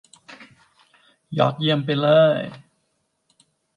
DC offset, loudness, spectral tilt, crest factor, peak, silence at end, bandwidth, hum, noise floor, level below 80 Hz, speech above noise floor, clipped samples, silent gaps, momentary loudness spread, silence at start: under 0.1%; -19 LUFS; -7.5 dB/octave; 18 dB; -4 dBFS; 1.2 s; 9.8 kHz; none; -71 dBFS; -70 dBFS; 53 dB; under 0.1%; none; 14 LU; 0.3 s